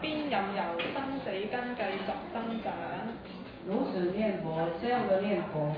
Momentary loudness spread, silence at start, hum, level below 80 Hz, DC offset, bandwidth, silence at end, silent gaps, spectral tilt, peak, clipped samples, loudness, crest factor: 8 LU; 0 s; none; -62 dBFS; under 0.1%; 5.2 kHz; 0 s; none; -9 dB/octave; -16 dBFS; under 0.1%; -33 LUFS; 16 dB